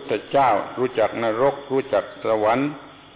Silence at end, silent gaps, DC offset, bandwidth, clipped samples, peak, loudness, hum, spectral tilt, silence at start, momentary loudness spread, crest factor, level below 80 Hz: 0.2 s; none; under 0.1%; 4 kHz; under 0.1%; -8 dBFS; -22 LUFS; none; -9.5 dB/octave; 0 s; 6 LU; 14 dB; -58 dBFS